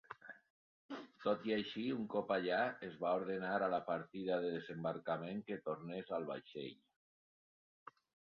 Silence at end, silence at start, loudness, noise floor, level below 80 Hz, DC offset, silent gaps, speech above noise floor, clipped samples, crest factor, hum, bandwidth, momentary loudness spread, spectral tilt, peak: 1.55 s; 0.1 s; -41 LUFS; under -90 dBFS; -82 dBFS; under 0.1%; 0.50-0.89 s; over 50 dB; under 0.1%; 18 dB; none; 6.6 kHz; 14 LU; -4 dB/octave; -24 dBFS